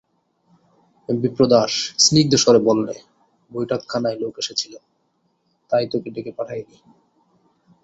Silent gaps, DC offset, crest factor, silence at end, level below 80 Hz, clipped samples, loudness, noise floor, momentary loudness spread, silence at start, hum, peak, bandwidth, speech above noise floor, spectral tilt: none; under 0.1%; 20 dB; 1.2 s; -58 dBFS; under 0.1%; -19 LUFS; -67 dBFS; 17 LU; 1.1 s; none; -2 dBFS; 8.2 kHz; 48 dB; -4 dB/octave